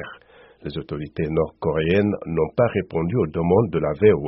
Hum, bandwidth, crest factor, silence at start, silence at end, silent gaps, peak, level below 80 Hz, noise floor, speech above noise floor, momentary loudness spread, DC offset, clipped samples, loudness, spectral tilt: none; 5.8 kHz; 18 dB; 0 s; 0 s; none; -4 dBFS; -44 dBFS; -50 dBFS; 29 dB; 13 LU; under 0.1%; under 0.1%; -22 LUFS; -7 dB/octave